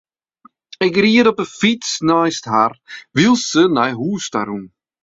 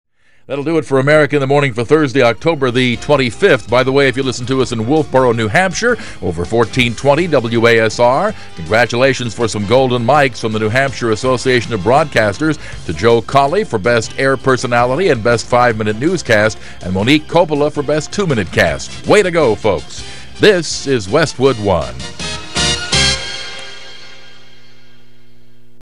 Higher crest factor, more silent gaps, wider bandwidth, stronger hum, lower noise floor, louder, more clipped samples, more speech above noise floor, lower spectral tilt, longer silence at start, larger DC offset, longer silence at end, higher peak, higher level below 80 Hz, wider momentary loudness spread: about the same, 16 dB vs 14 dB; neither; second, 8 kHz vs 14 kHz; neither; about the same, -52 dBFS vs -49 dBFS; second, -16 LUFS vs -13 LUFS; neither; about the same, 36 dB vs 36 dB; about the same, -4.5 dB/octave vs -4.5 dB/octave; first, 0.8 s vs 0.05 s; second, under 0.1% vs 3%; second, 0.35 s vs 1.75 s; about the same, 0 dBFS vs 0 dBFS; second, -56 dBFS vs -38 dBFS; about the same, 10 LU vs 10 LU